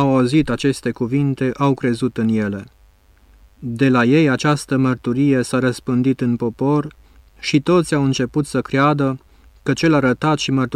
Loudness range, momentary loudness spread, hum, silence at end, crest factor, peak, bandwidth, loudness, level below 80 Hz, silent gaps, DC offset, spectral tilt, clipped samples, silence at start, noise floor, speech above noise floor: 3 LU; 7 LU; none; 0 s; 14 dB; -4 dBFS; 13 kHz; -18 LUFS; -48 dBFS; none; under 0.1%; -6.5 dB/octave; under 0.1%; 0 s; -51 dBFS; 34 dB